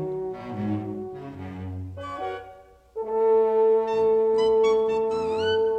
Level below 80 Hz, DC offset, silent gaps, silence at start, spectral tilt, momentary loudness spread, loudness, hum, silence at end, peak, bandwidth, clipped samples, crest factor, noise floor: -56 dBFS; under 0.1%; none; 0 s; -6.5 dB/octave; 16 LU; -23 LUFS; none; 0 s; -12 dBFS; 8.4 kHz; under 0.1%; 12 dB; -48 dBFS